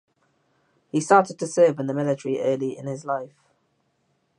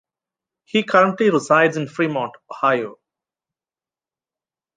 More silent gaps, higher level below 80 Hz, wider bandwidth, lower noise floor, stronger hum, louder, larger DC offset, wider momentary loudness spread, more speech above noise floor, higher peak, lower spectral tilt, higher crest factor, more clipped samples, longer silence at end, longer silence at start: neither; second, -78 dBFS vs -72 dBFS; first, 11 kHz vs 9.6 kHz; second, -70 dBFS vs under -90 dBFS; neither; second, -23 LUFS vs -18 LUFS; neither; about the same, 11 LU vs 10 LU; second, 48 dB vs over 72 dB; about the same, -2 dBFS vs -2 dBFS; about the same, -6 dB/octave vs -5.5 dB/octave; about the same, 22 dB vs 20 dB; neither; second, 1.15 s vs 1.85 s; first, 0.95 s vs 0.75 s